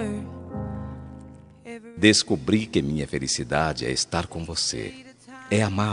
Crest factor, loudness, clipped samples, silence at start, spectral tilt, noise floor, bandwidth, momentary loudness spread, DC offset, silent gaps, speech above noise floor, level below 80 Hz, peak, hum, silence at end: 24 dB; -24 LUFS; under 0.1%; 0 s; -4 dB/octave; -45 dBFS; 11 kHz; 22 LU; under 0.1%; none; 21 dB; -48 dBFS; -2 dBFS; none; 0 s